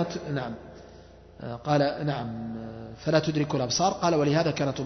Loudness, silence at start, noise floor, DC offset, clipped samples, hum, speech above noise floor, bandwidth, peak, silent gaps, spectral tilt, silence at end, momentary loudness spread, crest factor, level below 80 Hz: -27 LUFS; 0 s; -49 dBFS; under 0.1%; under 0.1%; none; 23 dB; 6.4 kHz; -10 dBFS; none; -5.5 dB/octave; 0 s; 15 LU; 18 dB; -56 dBFS